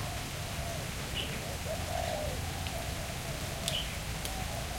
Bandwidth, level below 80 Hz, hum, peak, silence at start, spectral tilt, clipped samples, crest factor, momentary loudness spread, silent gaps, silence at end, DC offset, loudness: 16.5 kHz; -44 dBFS; none; -10 dBFS; 0 s; -3.5 dB/octave; under 0.1%; 26 dB; 4 LU; none; 0 s; under 0.1%; -36 LUFS